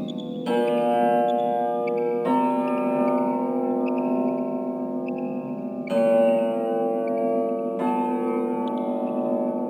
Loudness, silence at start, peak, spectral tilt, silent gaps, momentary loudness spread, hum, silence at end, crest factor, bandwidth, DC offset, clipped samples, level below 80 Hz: -24 LUFS; 0 s; -10 dBFS; -7.5 dB/octave; none; 8 LU; none; 0 s; 14 dB; 11.5 kHz; under 0.1%; under 0.1%; -76 dBFS